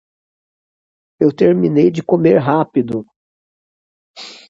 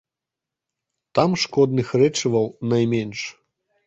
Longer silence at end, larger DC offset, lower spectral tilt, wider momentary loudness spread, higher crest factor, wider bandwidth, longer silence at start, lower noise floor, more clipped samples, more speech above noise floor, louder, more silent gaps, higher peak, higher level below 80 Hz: second, 0.15 s vs 0.55 s; neither; first, -8.5 dB/octave vs -5.5 dB/octave; first, 13 LU vs 9 LU; about the same, 16 dB vs 20 dB; about the same, 7.8 kHz vs 8.2 kHz; about the same, 1.2 s vs 1.15 s; about the same, under -90 dBFS vs -87 dBFS; neither; first, over 77 dB vs 67 dB; first, -14 LUFS vs -21 LUFS; first, 3.16-4.14 s vs none; first, 0 dBFS vs -4 dBFS; about the same, -56 dBFS vs -60 dBFS